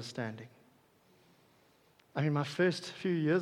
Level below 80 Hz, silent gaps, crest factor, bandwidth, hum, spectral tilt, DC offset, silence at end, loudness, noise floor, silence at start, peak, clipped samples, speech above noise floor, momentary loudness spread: -82 dBFS; none; 18 dB; 12 kHz; none; -6.5 dB/octave; under 0.1%; 0 s; -34 LUFS; -67 dBFS; 0 s; -18 dBFS; under 0.1%; 34 dB; 14 LU